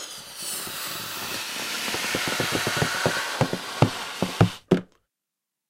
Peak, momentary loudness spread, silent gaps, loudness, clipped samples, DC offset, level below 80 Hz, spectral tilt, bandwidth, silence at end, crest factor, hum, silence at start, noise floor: -2 dBFS; 7 LU; none; -26 LUFS; under 0.1%; under 0.1%; -54 dBFS; -4 dB/octave; 16 kHz; 0.85 s; 26 dB; none; 0 s; -85 dBFS